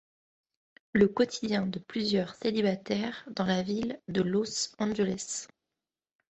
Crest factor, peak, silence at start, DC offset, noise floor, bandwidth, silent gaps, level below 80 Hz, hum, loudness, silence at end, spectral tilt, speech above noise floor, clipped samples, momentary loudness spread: 22 dB; -10 dBFS; 0.95 s; under 0.1%; under -90 dBFS; 8.4 kHz; none; -64 dBFS; none; -30 LUFS; 0.95 s; -5 dB/octave; over 60 dB; under 0.1%; 8 LU